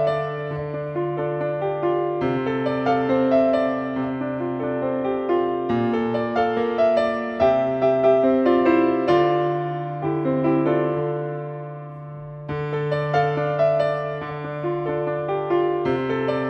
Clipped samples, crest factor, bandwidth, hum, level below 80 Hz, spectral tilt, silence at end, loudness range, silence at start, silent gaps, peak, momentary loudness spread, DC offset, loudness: under 0.1%; 16 dB; 6.2 kHz; none; -54 dBFS; -8.5 dB/octave; 0 s; 5 LU; 0 s; none; -6 dBFS; 10 LU; under 0.1%; -22 LUFS